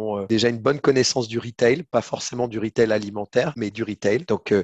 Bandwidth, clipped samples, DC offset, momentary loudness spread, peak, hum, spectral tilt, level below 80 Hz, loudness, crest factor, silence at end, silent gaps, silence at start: 8.8 kHz; under 0.1%; under 0.1%; 7 LU; -4 dBFS; none; -4.5 dB/octave; -56 dBFS; -22 LUFS; 18 dB; 0 s; none; 0 s